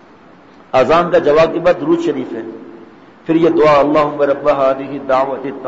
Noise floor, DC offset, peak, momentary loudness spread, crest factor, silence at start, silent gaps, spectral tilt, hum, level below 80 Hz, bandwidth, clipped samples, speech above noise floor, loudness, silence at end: -42 dBFS; 0.3%; -4 dBFS; 13 LU; 12 dB; 0.75 s; none; -7 dB/octave; none; -46 dBFS; 7.8 kHz; under 0.1%; 29 dB; -13 LUFS; 0 s